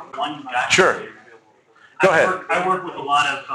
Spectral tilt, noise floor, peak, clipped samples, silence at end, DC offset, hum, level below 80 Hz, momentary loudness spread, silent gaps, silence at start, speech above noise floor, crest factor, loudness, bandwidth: -3 dB/octave; -53 dBFS; -2 dBFS; under 0.1%; 0 s; under 0.1%; none; -60 dBFS; 12 LU; none; 0 s; 34 dB; 18 dB; -19 LUFS; 12.5 kHz